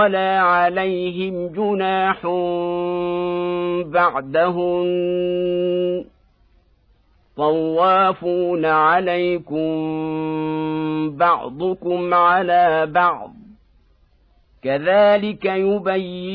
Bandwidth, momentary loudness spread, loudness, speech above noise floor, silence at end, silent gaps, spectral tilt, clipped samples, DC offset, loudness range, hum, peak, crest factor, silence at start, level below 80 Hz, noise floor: 5.2 kHz; 8 LU; -19 LUFS; 39 dB; 0 s; none; -9 dB/octave; under 0.1%; under 0.1%; 3 LU; none; -4 dBFS; 16 dB; 0 s; -56 dBFS; -57 dBFS